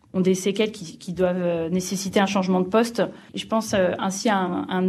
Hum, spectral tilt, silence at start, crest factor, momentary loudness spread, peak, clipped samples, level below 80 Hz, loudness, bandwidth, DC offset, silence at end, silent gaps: none; -5 dB/octave; 0.15 s; 18 dB; 6 LU; -6 dBFS; under 0.1%; -58 dBFS; -23 LUFS; 13.5 kHz; under 0.1%; 0 s; none